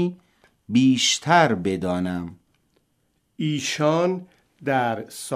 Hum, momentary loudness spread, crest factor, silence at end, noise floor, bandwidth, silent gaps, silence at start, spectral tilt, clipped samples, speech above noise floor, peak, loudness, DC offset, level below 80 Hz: none; 14 LU; 20 dB; 0 s; -69 dBFS; 15.5 kHz; none; 0 s; -4.5 dB/octave; under 0.1%; 48 dB; -4 dBFS; -22 LUFS; under 0.1%; -62 dBFS